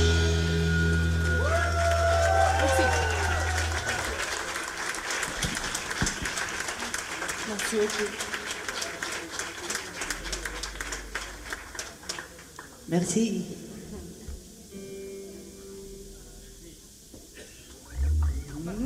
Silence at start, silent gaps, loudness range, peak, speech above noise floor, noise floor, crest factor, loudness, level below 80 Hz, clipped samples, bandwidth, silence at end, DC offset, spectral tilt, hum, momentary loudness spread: 0 s; none; 17 LU; -10 dBFS; 21 dB; -49 dBFS; 18 dB; -28 LUFS; -36 dBFS; under 0.1%; 16 kHz; 0 s; under 0.1%; -4 dB/octave; none; 21 LU